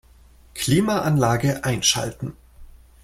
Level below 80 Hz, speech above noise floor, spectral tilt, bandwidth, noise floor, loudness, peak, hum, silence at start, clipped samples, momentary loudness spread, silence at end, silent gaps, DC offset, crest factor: -46 dBFS; 30 dB; -4 dB/octave; 16.5 kHz; -51 dBFS; -21 LUFS; -4 dBFS; none; 0.55 s; under 0.1%; 15 LU; 0.4 s; none; under 0.1%; 20 dB